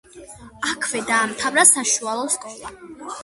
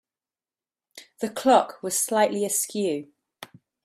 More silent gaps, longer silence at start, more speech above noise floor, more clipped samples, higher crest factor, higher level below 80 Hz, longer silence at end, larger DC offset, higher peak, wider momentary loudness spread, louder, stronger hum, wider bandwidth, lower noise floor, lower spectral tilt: neither; second, 0.15 s vs 0.95 s; second, 21 dB vs over 67 dB; neither; about the same, 22 dB vs 20 dB; first, -58 dBFS vs -74 dBFS; second, 0 s vs 0.4 s; neither; first, 0 dBFS vs -6 dBFS; first, 23 LU vs 12 LU; first, -18 LUFS vs -24 LUFS; neither; second, 12 kHz vs 16 kHz; second, -42 dBFS vs under -90 dBFS; second, -0.5 dB/octave vs -3 dB/octave